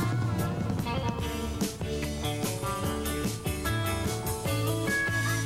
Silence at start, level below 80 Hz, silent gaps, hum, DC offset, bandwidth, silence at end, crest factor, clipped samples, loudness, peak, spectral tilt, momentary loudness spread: 0 s; -42 dBFS; none; none; under 0.1%; 16.5 kHz; 0 s; 12 dB; under 0.1%; -30 LUFS; -18 dBFS; -5 dB/octave; 5 LU